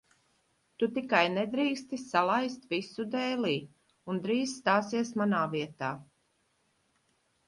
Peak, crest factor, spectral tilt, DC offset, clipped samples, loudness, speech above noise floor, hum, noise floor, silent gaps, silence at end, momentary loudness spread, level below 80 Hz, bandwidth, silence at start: -12 dBFS; 20 dB; -5 dB/octave; under 0.1%; under 0.1%; -31 LUFS; 43 dB; none; -74 dBFS; none; 1.45 s; 10 LU; -74 dBFS; 11.5 kHz; 0.8 s